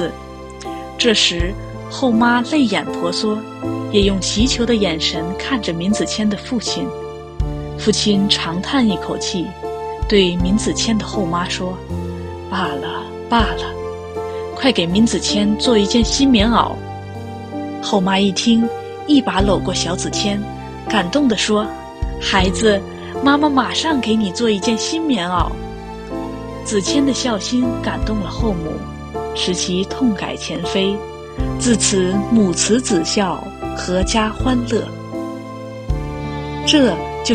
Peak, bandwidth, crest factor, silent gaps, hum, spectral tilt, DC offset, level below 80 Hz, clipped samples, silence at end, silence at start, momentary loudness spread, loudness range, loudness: 0 dBFS; 11 kHz; 18 dB; none; none; -4 dB/octave; under 0.1%; -32 dBFS; under 0.1%; 0 s; 0 s; 13 LU; 4 LU; -18 LUFS